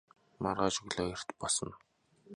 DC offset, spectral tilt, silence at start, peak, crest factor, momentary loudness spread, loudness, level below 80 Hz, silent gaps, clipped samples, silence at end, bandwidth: under 0.1%; -3 dB/octave; 0.4 s; -14 dBFS; 22 dB; 7 LU; -35 LUFS; -60 dBFS; none; under 0.1%; 0 s; 11 kHz